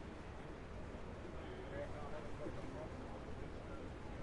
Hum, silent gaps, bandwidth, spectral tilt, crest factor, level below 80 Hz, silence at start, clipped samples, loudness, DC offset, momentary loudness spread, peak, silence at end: none; none; 11 kHz; -6.5 dB/octave; 14 dB; -56 dBFS; 0 s; under 0.1%; -50 LUFS; under 0.1%; 4 LU; -34 dBFS; 0 s